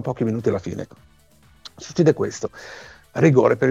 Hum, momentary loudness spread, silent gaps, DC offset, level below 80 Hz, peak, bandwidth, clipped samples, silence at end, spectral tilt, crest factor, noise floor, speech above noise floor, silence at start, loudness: none; 22 LU; none; under 0.1%; -56 dBFS; -4 dBFS; 9.4 kHz; under 0.1%; 0 s; -7 dB/octave; 18 dB; -54 dBFS; 34 dB; 0 s; -20 LUFS